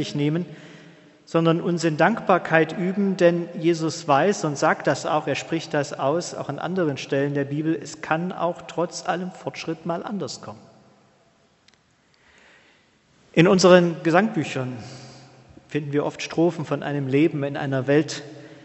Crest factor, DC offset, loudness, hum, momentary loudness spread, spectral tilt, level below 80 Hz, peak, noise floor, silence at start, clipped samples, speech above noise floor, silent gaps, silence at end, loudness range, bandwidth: 24 dB; under 0.1%; -22 LUFS; none; 12 LU; -5.5 dB/octave; -66 dBFS; 0 dBFS; -61 dBFS; 0 s; under 0.1%; 39 dB; none; 0.05 s; 10 LU; 8.2 kHz